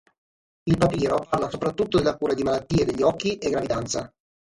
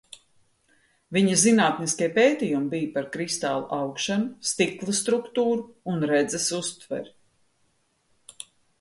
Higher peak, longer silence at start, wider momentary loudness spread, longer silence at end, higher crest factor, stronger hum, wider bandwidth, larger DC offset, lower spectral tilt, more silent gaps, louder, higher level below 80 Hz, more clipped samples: about the same, -6 dBFS vs -6 dBFS; second, 0.65 s vs 1.1 s; second, 6 LU vs 15 LU; second, 0.45 s vs 1.7 s; about the same, 18 dB vs 20 dB; neither; about the same, 11.5 kHz vs 11.5 kHz; neither; first, -6 dB/octave vs -3.5 dB/octave; neither; about the same, -24 LUFS vs -24 LUFS; first, -46 dBFS vs -68 dBFS; neither